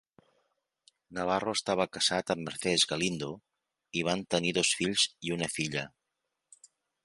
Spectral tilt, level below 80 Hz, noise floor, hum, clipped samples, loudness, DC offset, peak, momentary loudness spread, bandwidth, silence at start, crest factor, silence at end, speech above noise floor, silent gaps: -3 dB/octave; -64 dBFS; -85 dBFS; none; under 0.1%; -30 LUFS; under 0.1%; -10 dBFS; 11 LU; 11.5 kHz; 1.1 s; 22 dB; 1.15 s; 54 dB; none